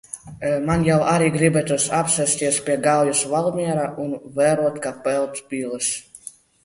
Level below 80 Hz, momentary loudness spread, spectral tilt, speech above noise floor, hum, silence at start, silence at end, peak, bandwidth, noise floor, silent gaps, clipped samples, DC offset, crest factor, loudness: -50 dBFS; 11 LU; -4.5 dB/octave; 22 dB; none; 0.15 s; 0.35 s; -2 dBFS; 11.5 kHz; -43 dBFS; none; under 0.1%; under 0.1%; 18 dB; -20 LUFS